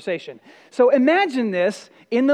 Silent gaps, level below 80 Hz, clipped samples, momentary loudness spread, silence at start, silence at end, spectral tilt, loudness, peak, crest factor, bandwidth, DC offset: none; -82 dBFS; under 0.1%; 18 LU; 0.05 s; 0 s; -5.5 dB/octave; -19 LUFS; -4 dBFS; 16 dB; 10.5 kHz; under 0.1%